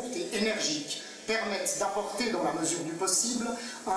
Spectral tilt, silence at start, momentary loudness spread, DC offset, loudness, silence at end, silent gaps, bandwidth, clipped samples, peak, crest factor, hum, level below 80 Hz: -2 dB/octave; 0 s; 8 LU; under 0.1%; -30 LUFS; 0 s; none; 11 kHz; under 0.1%; -14 dBFS; 18 dB; none; -68 dBFS